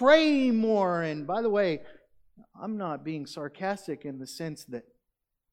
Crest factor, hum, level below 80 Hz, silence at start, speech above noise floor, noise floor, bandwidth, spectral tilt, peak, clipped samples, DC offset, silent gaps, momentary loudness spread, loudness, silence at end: 20 dB; none; -70 dBFS; 0 s; 55 dB; -83 dBFS; 15.5 kHz; -5.5 dB/octave; -8 dBFS; under 0.1%; under 0.1%; none; 15 LU; -28 LUFS; 0.7 s